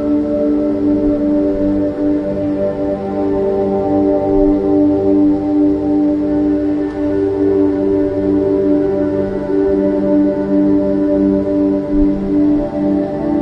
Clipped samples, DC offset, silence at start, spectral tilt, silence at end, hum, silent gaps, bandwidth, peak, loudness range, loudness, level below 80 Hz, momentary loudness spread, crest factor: under 0.1%; under 0.1%; 0 s; -10 dB/octave; 0 s; none; none; 5.4 kHz; -2 dBFS; 2 LU; -15 LUFS; -34 dBFS; 4 LU; 12 dB